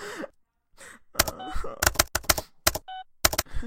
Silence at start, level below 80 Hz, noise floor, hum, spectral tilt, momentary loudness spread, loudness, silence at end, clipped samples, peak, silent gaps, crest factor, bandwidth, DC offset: 0 s; -38 dBFS; -61 dBFS; none; -1.5 dB/octave; 15 LU; -25 LUFS; 0 s; under 0.1%; -2 dBFS; none; 26 dB; 17 kHz; under 0.1%